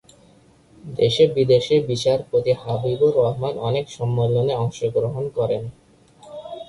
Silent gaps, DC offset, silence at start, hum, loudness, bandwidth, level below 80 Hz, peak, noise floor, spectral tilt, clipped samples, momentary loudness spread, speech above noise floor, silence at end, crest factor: none; under 0.1%; 0.85 s; none; -20 LUFS; 11.5 kHz; -52 dBFS; -4 dBFS; -53 dBFS; -6.5 dB/octave; under 0.1%; 10 LU; 33 dB; 0.05 s; 16 dB